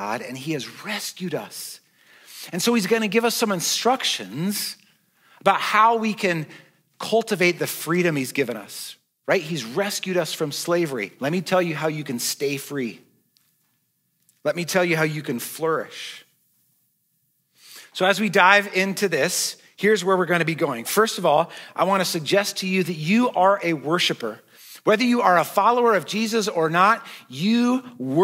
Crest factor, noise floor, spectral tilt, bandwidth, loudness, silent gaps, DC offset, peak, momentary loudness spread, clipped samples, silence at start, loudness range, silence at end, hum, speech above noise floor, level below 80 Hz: 22 dB; -70 dBFS; -4 dB/octave; 16 kHz; -22 LUFS; none; under 0.1%; 0 dBFS; 12 LU; under 0.1%; 0 s; 6 LU; 0 s; none; 48 dB; -82 dBFS